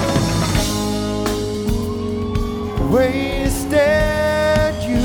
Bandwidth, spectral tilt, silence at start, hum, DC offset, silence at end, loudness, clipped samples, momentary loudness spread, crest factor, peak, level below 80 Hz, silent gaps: over 20 kHz; -5.5 dB/octave; 0 s; none; under 0.1%; 0 s; -18 LUFS; under 0.1%; 6 LU; 14 dB; -4 dBFS; -28 dBFS; none